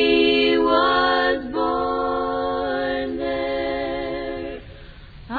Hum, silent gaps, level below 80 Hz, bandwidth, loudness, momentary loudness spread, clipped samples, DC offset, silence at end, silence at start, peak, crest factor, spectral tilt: none; none; -44 dBFS; 4.9 kHz; -21 LUFS; 11 LU; under 0.1%; under 0.1%; 0 s; 0 s; -4 dBFS; 16 dB; -6.5 dB/octave